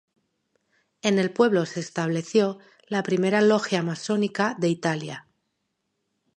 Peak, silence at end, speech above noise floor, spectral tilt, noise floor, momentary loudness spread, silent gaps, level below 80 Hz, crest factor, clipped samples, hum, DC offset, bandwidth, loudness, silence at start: -6 dBFS; 1.2 s; 54 dB; -5.5 dB/octave; -77 dBFS; 10 LU; none; -74 dBFS; 20 dB; under 0.1%; none; under 0.1%; 11 kHz; -24 LUFS; 1.05 s